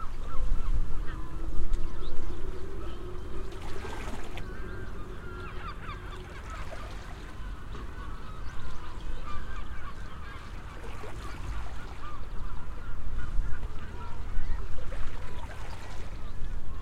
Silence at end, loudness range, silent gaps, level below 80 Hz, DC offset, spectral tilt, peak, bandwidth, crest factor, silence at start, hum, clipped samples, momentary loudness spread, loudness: 0 s; 3 LU; none; -34 dBFS; under 0.1%; -6 dB/octave; -10 dBFS; 7 kHz; 16 dB; 0 s; none; under 0.1%; 6 LU; -41 LUFS